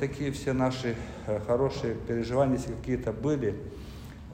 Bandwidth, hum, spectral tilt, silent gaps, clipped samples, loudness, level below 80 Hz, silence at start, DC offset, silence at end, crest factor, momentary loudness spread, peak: 16 kHz; none; -7 dB/octave; none; under 0.1%; -30 LUFS; -46 dBFS; 0 s; under 0.1%; 0 s; 18 dB; 13 LU; -12 dBFS